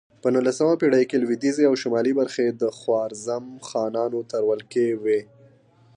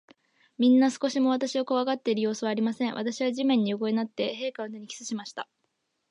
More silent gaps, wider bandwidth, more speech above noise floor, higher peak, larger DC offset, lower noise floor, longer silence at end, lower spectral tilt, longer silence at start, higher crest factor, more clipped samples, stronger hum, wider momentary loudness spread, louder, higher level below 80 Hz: neither; about the same, 10.5 kHz vs 10.5 kHz; second, 33 dB vs 51 dB; first, -6 dBFS vs -12 dBFS; neither; second, -55 dBFS vs -77 dBFS; about the same, 0.75 s vs 0.65 s; about the same, -5.5 dB/octave vs -4.5 dB/octave; second, 0.25 s vs 0.6 s; about the same, 16 dB vs 14 dB; neither; neither; second, 8 LU vs 15 LU; first, -23 LUFS vs -27 LUFS; first, -74 dBFS vs -82 dBFS